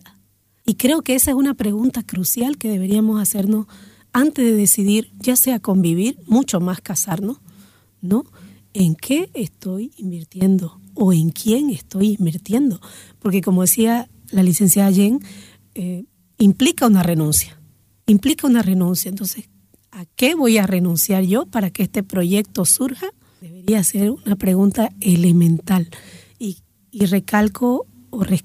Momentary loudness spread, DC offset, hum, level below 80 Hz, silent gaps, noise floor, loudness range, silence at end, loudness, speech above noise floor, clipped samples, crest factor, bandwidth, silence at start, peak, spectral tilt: 13 LU; under 0.1%; none; -50 dBFS; none; -58 dBFS; 4 LU; 0.05 s; -17 LUFS; 41 dB; under 0.1%; 16 dB; 16 kHz; 0.65 s; -2 dBFS; -5 dB/octave